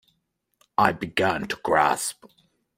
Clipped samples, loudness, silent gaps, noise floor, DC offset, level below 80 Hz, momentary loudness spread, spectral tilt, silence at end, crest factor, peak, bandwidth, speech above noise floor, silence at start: under 0.1%; -24 LUFS; none; -75 dBFS; under 0.1%; -60 dBFS; 8 LU; -3.5 dB/octave; 0.65 s; 24 dB; -2 dBFS; 16 kHz; 51 dB; 0.8 s